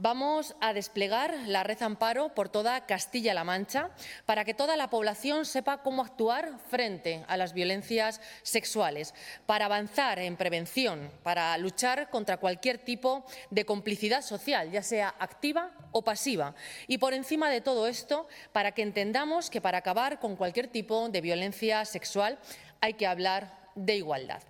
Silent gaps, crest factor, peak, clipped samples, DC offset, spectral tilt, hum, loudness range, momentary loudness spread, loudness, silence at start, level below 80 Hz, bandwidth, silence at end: none; 22 dB; -10 dBFS; under 0.1%; under 0.1%; -3 dB/octave; none; 1 LU; 5 LU; -31 LUFS; 0 s; -72 dBFS; 18 kHz; 0.05 s